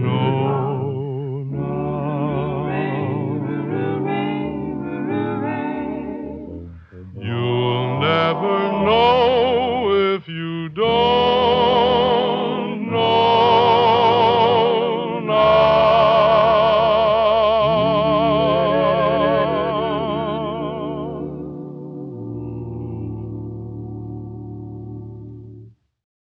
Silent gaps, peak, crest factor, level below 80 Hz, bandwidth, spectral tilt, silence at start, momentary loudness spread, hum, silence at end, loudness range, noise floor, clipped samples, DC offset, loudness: none; -4 dBFS; 16 dB; -46 dBFS; 6.2 kHz; -8 dB/octave; 0 s; 18 LU; none; 0.65 s; 15 LU; -44 dBFS; under 0.1%; under 0.1%; -18 LUFS